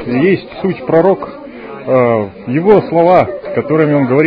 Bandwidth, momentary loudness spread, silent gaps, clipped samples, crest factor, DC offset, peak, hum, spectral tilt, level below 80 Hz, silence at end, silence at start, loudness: 5.2 kHz; 11 LU; none; 0.2%; 12 dB; under 0.1%; 0 dBFS; none; -10 dB/octave; -48 dBFS; 0 s; 0 s; -12 LUFS